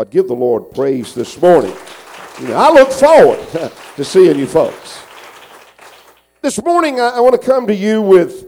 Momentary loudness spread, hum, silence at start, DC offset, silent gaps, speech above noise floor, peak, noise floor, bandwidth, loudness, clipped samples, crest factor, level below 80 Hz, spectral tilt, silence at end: 20 LU; none; 0 s; under 0.1%; none; 34 dB; 0 dBFS; -45 dBFS; 17 kHz; -11 LUFS; under 0.1%; 12 dB; -50 dBFS; -5.5 dB/octave; 0 s